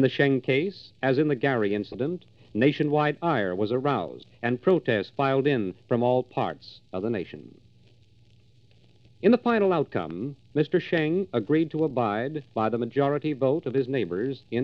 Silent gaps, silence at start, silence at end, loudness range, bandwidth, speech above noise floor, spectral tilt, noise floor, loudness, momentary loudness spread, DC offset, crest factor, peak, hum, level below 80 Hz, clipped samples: none; 0 s; 0 s; 4 LU; 6.2 kHz; 33 dB; -9 dB/octave; -58 dBFS; -26 LUFS; 9 LU; under 0.1%; 18 dB; -8 dBFS; none; -66 dBFS; under 0.1%